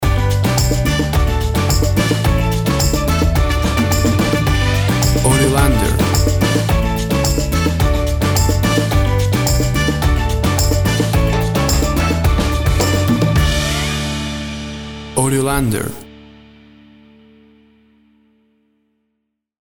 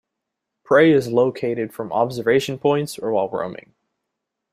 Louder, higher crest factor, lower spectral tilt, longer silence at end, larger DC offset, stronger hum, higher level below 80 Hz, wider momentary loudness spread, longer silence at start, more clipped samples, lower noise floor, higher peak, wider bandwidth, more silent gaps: first, -16 LUFS vs -20 LUFS; about the same, 16 dB vs 18 dB; about the same, -5 dB/octave vs -6 dB/octave; first, 3.45 s vs 0.95 s; neither; neither; first, -22 dBFS vs -62 dBFS; second, 4 LU vs 11 LU; second, 0 s vs 0.7 s; neither; second, -73 dBFS vs -81 dBFS; about the same, 0 dBFS vs -2 dBFS; first, over 20 kHz vs 15.5 kHz; neither